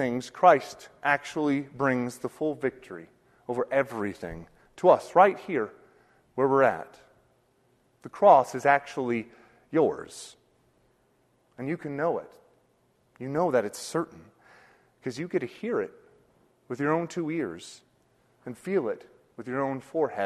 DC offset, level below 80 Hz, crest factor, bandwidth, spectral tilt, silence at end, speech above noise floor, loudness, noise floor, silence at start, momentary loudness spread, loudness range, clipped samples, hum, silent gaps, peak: under 0.1%; -66 dBFS; 24 dB; 13 kHz; -6 dB/octave; 0 s; 41 dB; -27 LUFS; -67 dBFS; 0 s; 22 LU; 8 LU; under 0.1%; none; none; -6 dBFS